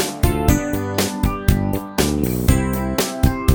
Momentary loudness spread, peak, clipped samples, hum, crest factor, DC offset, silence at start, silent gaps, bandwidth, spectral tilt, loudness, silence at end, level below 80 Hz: 3 LU; 0 dBFS; under 0.1%; none; 18 dB; under 0.1%; 0 s; none; over 20 kHz; -5.5 dB/octave; -19 LUFS; 0 s; -24 dBFS